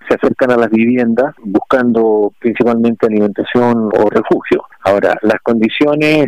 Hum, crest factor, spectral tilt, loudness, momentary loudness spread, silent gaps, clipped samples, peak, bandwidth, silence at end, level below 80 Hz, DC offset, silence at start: none; 10 dB; -7 dB/octave; -13 LUFS; 4 LU; none; under 0.1%; -2 dBFS; 10.5 kHz; 0 s; -48 dBFS; 0.4%; 0.05 s